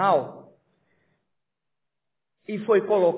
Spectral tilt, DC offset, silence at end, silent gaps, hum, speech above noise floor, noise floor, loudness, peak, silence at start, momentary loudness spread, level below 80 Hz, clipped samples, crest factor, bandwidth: -10 dB/octave; under 0.1%; 0 s; none; none; 64 dB; -86 dBFS; -23 LUFS; -8 dBFS; 0 s; 19 LU; -80 dBFS; under 0.1%; 18 dB; 4 kHz